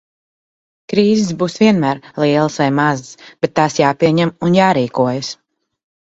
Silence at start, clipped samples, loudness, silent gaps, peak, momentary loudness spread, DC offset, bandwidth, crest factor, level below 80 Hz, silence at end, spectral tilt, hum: 0.9 s; under 0.1%; -15 LUFS; none; 0 dBFS; 8 LU; under 0.1%; 8 kHz; 16 dB; -54 dBFS; 0.75 s; -6 dB/octave; none